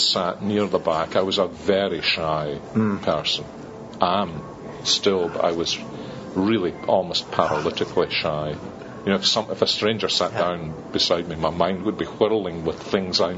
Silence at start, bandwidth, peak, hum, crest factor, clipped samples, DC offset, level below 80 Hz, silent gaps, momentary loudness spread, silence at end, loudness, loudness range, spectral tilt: 0 s; 8 kHz; -2 dBFS; none; 22 dB; under 0.1%; under 0.1%; -52 dBFS; none; 9 LU; 0 s; -22 LUFS; 2 LU; -3 dB/octave